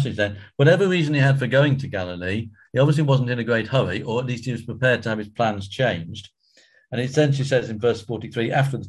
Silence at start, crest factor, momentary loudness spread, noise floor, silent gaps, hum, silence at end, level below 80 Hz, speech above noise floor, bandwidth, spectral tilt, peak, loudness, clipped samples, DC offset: 0 s; 16 dB; 10 LU; -57 dBFS; none; none; 0 s; -50 dBFS; 36 dB; 11.5 kHz; -6.5 dB/octave; -4 dBFS; -22 LUFS; under 0.1%; under 0.1%